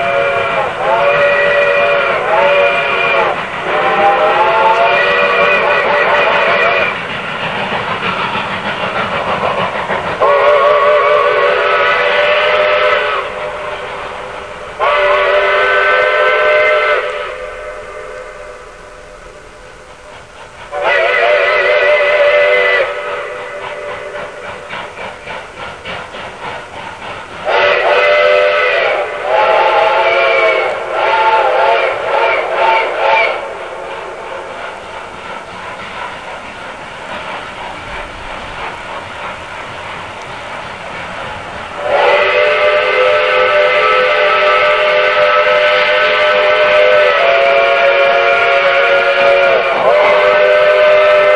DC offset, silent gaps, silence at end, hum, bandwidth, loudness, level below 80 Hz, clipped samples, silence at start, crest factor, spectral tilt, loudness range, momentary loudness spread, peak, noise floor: 0.4%; none; 0 s; none; 10.5 kHz; -10 LUFS; -46 dBFS; under 0.1%; 0 s; 12 dB; -3.5 dB/octave; 15 LU; 16 LU; 0 dBFS; -34 dBFS